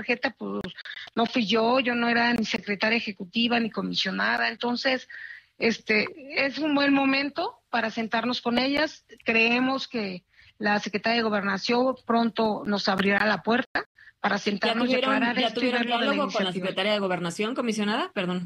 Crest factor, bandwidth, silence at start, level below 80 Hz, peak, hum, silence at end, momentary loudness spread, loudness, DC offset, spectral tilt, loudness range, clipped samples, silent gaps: 16 dB; 12 kHz; 0 s; -64 dBFS; -10 dBFS; none; 0 s; 9 LU; -25 LUFS; under 0.1%; -4.5 dB/octave; 2 LU; under 0.1%; 13.66-13.75 s, 13.86-13.95 s